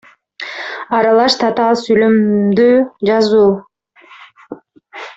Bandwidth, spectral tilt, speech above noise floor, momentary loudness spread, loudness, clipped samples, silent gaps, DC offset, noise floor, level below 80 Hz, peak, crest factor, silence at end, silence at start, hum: 8 kHz; -5.5 dB/octave; 33 dB; 14 LU; -12 LUFS; under 0.1%; none; under 0.1%; -44 dBFS; -56 dBFS; 0 dBFS; 14 dB; 0.05 s; 0.4 s; none